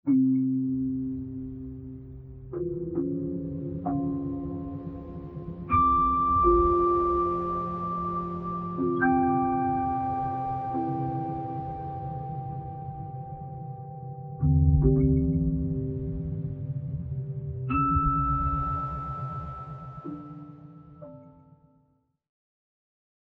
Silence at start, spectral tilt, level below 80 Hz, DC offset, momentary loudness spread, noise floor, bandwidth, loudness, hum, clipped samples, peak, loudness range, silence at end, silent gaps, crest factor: 0.05 s; -12 dB/octave; -38 dBFS; under 0.1%; 17 LU; -69 dBFS; 3.7 kHz; -28 LUFS; none; under 0.1%; -10 dBFS; 11 LU; 2 s; none; 18 dB